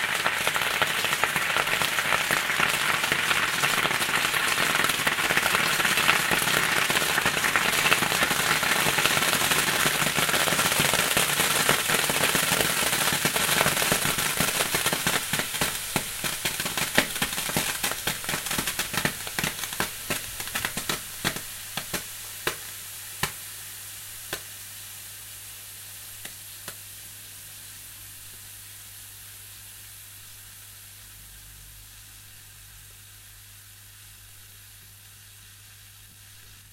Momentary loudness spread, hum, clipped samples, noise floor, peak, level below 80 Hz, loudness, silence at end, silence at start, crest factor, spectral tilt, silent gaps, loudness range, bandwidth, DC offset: 20 LU; none; under 0.1%; -49 dBFS; 0 dBFS; -54 dBFS; -23 LUFS; 0 s; 0 s; 26 dB; -1 dB/octave; none; 21 LU; 16 kHz; under 0.1%